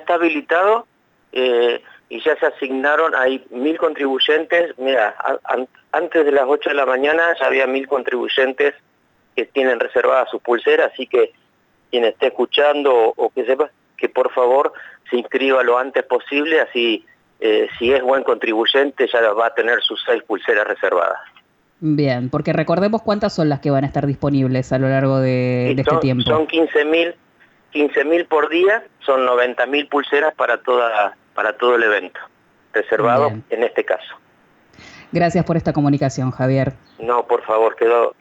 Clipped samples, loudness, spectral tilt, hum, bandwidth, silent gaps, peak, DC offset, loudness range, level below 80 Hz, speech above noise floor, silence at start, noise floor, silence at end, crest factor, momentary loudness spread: under 0.1%; -17 LUFS; -6.5 dB/octave; none; 8 kHz; none; -4 dBFS; under 0.1%; 2 LU; -54 dBFS; 42 dB; 0 s; -59 dBFS; 0.1 s; 14 dB; 7 LU